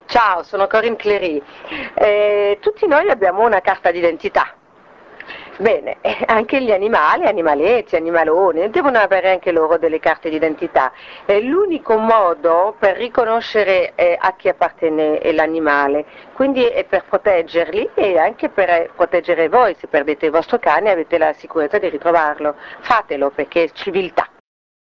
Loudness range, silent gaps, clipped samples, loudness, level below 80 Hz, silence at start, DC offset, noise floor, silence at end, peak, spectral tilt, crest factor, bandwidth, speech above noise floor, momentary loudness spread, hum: 3 LU; none; under 0.1%; -16 LUFS; -52 dBFS; 0.1 s; under 0.1%; -46 dBFS; 0.7 s; 0 dBFS; -6 dB/octave; 16 dB; 6.8 kHz; 30 dB; 6 LU; none